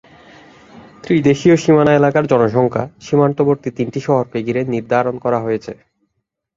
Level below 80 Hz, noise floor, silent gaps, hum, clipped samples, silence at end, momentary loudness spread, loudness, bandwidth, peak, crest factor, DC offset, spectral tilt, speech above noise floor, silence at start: -52 dBFS; -73 dBFS; none; none; under 0.1%; 0.85 s; 10 LU; -15 LUFS; 7.8 kHz; 0 dBFS; 16 dB; under 0.1%; -7.5 dB/octave; 58 dB; 0.75 s